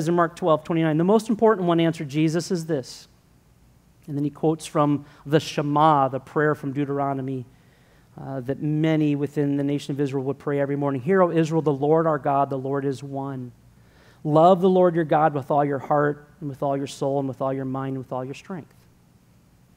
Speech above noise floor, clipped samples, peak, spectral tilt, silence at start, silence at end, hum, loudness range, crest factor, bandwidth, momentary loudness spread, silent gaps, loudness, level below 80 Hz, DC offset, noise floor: 34 dB; under 0.1%; -4 dBFS; -7 dB/octave; 0 s; 1.15 s; none; 5 LU; 20 dB; 15.5 kHz; 13 LU; none; -23 LUFS; -62 dBFS; under 0.1%; -57 dBFS